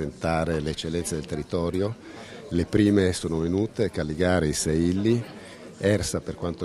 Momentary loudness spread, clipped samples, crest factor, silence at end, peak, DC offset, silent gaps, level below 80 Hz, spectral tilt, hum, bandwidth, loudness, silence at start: 10 LU; under 0.1%; 18 dB; 0 s; -6 dBFS; under 0.1%; none; -46 dBFS; -5.5 dB/octave; none; 14 kHz; -25 LUFS; 0 s